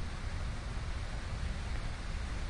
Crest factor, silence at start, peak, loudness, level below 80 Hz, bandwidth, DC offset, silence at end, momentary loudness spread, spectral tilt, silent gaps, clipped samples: 12 dB; 0 s; -26 dBFS; -41 LUFS; -40 dBFS; 11 kHz; under 0.1%; 0 s; 1 LU; -5 dB/octave; none; under 0.1%